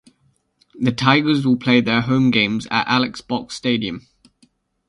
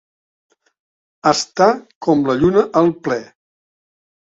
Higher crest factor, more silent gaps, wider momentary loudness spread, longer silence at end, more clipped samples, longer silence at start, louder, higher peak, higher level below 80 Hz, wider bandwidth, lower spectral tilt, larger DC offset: about the same, 20 dB vs 18 dB; second, none vs 1.95-2.01 s; about the same, 9 LU vs 9 LU; about the same, 0.9 s vs 1 s; neither; second, 0.75 s vs 1.25 s; about the same, -18 LUFS vs -16 LUFS; about the same, 0 dBFS vs 0 dBFS; about the same, -52 dBFS vs -50 dBFS; first, 11 kHz vs 7.8 kHz; about the same, -5.5 dB/octave vs -5 dB/octave; neither